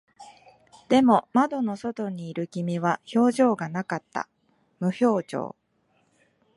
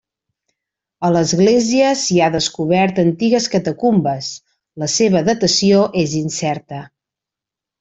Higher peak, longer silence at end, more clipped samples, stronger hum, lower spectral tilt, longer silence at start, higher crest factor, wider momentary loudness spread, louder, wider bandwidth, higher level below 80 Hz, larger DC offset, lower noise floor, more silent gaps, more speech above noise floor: second, -6 dBFS vs -2 dBFS; first, 1.1 s vs 0.95 s; neither; neither; first, -6.5 dB/octave vs -4.5 dB/octave; second, 0.2 s vs 1 s; about the same, 20 dB vs 16 dB; about the same, 13 LU vs 12 LU; second, -25 LUFS vs -15 LUFS; first, 11.5 kHz vs 8.2 kHz; second, -70 dBFS vs -54 dBFS; neither; second, -68 dBFS vs -86 dBFS; neither; second, 44 dB vs 71 dB